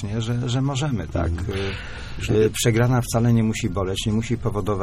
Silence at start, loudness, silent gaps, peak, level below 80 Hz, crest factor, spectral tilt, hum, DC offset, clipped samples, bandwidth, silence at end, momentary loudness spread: 0 s; -22 LUFS; none; -6 dBFS; -36 dBFS; 16 dB; -6 dB/octave; none; under 0.1%; under 0.1%; 15 kHz; 0 s; 8 LU